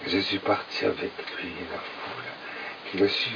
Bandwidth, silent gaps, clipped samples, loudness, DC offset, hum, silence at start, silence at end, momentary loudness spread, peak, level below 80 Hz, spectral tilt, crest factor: 5.4 kHz; none; under 0.1%; -29 LUFS; under 0.1%; none; 0 s; 0 s; 11 LU; -10 dBFS; -64 dBFS; -5 dB/octave; 20 dB